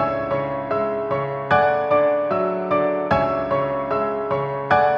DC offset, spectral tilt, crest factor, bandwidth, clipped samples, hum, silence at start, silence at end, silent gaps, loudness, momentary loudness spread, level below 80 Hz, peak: under 0.1%; -8 dB/octave; 18 dB; 6.2 kHz; under 0.1%; none; 0 s; 0 s; none; -21 LUFS; 6 LU; -50 dBFS; -4 dBFS